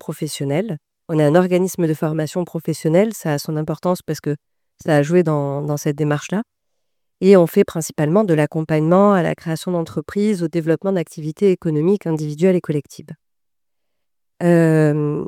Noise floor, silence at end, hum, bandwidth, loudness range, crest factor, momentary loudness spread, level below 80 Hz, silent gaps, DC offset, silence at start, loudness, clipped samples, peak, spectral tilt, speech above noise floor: -85 dBFS; 0 s; none; 16.5 kHz; 4 LU; 18 dB; 11 LU; -60 dBFS; none; under 0.1%; 0.1 s; -18 LUFS; under 0.1%; 0 dBFS; -7 dB/octave; 68 dB